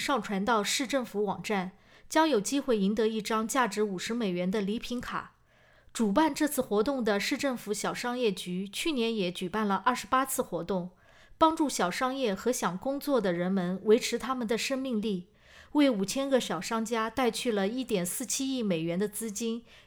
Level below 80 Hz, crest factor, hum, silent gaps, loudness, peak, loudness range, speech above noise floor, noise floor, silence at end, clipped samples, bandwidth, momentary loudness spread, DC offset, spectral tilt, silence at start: -60 dBFS; 20 dB; none; none; -29 LUFS; -8 dBFS; 2 LU; 33 dB; -62 dBFS; 0.1 s; under 0.1%; over 20 kHz; 7 LU; under 0.1%; -4 dB/octave; 0 s